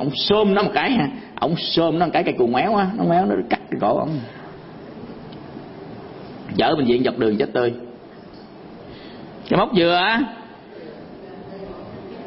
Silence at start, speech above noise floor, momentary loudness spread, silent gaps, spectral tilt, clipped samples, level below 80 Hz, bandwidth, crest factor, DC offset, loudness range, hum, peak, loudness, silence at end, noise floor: 0 s; 21 dB; 21 LU; none; -10 dB/octave; under 0.1%; -52 dBFS; 5.8 kHz; 18 dB; under 0.1%; 5 LU; none; -4 dBFS; -19 LUFS; 0 s; -40 dBFS